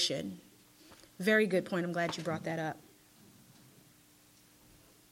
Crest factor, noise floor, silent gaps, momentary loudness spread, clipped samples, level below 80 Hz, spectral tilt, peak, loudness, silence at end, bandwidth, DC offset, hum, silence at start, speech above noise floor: 22 dB; -63 dBFS; none; 20 LU; under 0.1%; -76 dBFS; -4.5 dB/octave; -14 dBFS; -33 LUFS; 2.3 s; 16.5 kHz; under 0.1%; none; 0 s; 30 dB